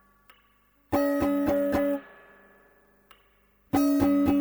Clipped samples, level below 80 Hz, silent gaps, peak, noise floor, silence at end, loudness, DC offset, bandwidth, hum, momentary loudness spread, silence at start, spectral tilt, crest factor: under 0.1%; -52 dBFS; none; -12 dBFS; -65 dBFS; 0 s; -26 LUFS; under 0.1%; over 20 kHz; 50 Hz at -60 dBFS; 7 LU; 0.9 s; -6.5 dB/octave; 16 dB